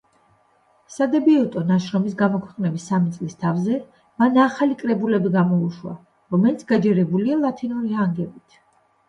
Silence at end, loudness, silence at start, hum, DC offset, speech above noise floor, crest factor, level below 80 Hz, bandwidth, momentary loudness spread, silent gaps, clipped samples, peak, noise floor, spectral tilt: 0.75 s; -21 LUFS; 0.9 s; none; under 0.1%; 40 dB; 16 dB; -64 dBFS; 9.8 kHz; 9 LU; none; under 0.1%; -4 dBFS; -60 dBFS; -8 dB/octave